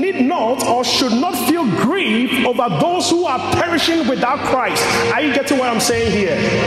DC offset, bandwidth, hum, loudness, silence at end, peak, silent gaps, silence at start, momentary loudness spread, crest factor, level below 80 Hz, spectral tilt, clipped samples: under 0.1%; 16 kHz; none; -16 LUFS; 0 s; -2 dBFS; none; 0 s; 2 LU; 14 dB; -46 dBFS; -4 dB/octave; under 0.1%